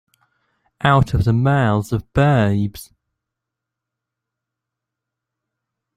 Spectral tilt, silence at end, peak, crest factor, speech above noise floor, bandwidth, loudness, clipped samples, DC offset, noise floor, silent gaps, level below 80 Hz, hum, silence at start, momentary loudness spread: -7.5 dB/octave; 3.15 s; -2 dBFS; 20 dB; 67 dB; 14.5 kHz; -17 LUFS; under 0.1%; under 0.1%; -83 dBFS; none; -40 dBFS; none; 0.85 s; 7 LU